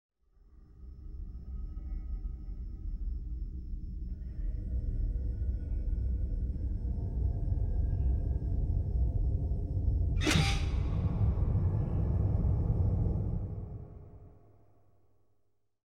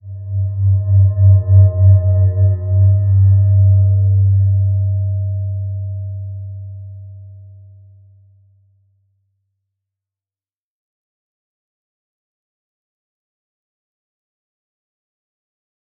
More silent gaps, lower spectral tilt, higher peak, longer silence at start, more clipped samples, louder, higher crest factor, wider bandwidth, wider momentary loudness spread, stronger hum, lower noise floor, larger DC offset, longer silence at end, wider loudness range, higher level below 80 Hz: neither; second, -6 dB/octave vs -16 dB/octave; second, -16 dBFS vs -2 dBFS; first, 0.5 s vs 0.05 s; neither; second, -34 LUFS vs -14 LUFS; about the same, 18 dB vs 14 dB; first, 12 kHz vs 1.1 kHz; second, 14 LU vs 18 LU; neither; second, -76 dBFS vs under -90 dBFS; neither; second, 1.65 s vs 8.55 s; second, 11 LU vs 18 LU; first, -34 dBFS vs -48 dBFS